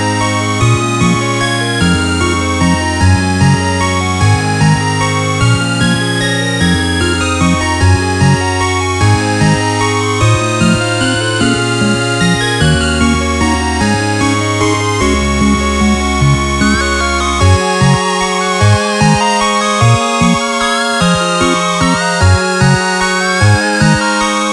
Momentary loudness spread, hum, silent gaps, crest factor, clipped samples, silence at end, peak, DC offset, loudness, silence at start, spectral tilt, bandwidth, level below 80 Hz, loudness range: 2 LU; none; none; 12 dB; under 0.1%; 0 s; 0 dBFS; under 0.1%; -11 LUFS; 0 s; -4.5 dB/octave; 12.5 kHz; -26 dBFS; 1 LU